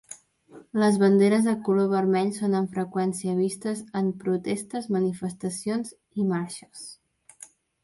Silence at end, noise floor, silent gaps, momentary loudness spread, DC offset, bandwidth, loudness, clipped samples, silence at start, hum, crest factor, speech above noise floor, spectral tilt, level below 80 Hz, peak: 0.4 s; -51 dBFS; none; 15 LU; under 0.1%; 11.5 kHz; -25 LUFS; under 0.1%; 0.1 s; none; 18 dB; 27 dB; -6.5 dB/octave; -70 dBFS; -8 dBFS